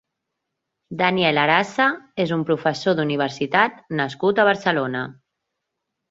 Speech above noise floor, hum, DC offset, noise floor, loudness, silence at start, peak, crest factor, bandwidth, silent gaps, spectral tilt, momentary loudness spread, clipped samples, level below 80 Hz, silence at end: 60 dB; none; under 0.1%; -80 dBFS; -20 LUFS; 0.9 s; -2 dBFS; 20 dB; 8 kHz; none; -5.5 dB/octave; 8 LU; under 0.1%; -64 dBFS; 1 s